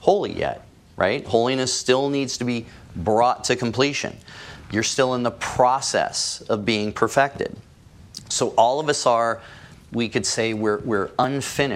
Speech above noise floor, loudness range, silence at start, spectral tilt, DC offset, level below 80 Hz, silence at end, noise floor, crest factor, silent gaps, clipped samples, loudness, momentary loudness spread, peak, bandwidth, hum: 21 dB; 1 LU; 0 s; -3.5 dB/octave; under 0.1%; -54 dBFS; 0 s; -43 dBFS; 20 dB; none; under 0.1%; -22 LUFS; 12 LU; -2 dBFS; 16 kHz; none